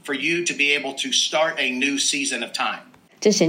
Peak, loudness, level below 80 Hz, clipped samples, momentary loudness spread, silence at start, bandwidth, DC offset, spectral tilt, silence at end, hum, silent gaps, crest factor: -6 dBFS; -21 LUFS; -78 dBFS; under 0.1%; 6 LU; 0.05 s; 16 kHz; under 0.1%; -2 dB/octave; 0 s; none; none; 16 dB